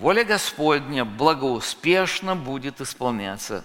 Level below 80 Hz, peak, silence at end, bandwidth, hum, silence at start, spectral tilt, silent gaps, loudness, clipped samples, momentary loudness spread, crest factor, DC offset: -54 dBFS; -2 dBFS; 0 s; 17 kHz; none; 0 s; -4 dB/octave; none; -23 LUFS; under 0.1%; 10 LU; 20 dB; under 0.1%